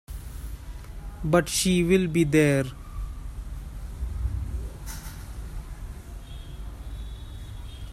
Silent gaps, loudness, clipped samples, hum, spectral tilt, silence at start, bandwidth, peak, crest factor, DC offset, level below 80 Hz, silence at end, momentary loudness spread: none; -25 LUFS; under 0.1%; none; -5 dB/octave; 0.1 s; 16 kHz; -8 dBFS; 20 dB; under 0.1%; -36 dBFS; 0 s; 20 LU